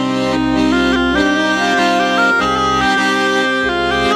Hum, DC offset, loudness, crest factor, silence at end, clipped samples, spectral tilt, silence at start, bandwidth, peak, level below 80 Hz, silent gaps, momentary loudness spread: none; under 0.1%; -14 LUFS; 12 dB; 0 s; under 0.1%; -4 dB/octave; 0 s; 14 kHz; -2 dBFS; -36 dBFS; none; 2 LU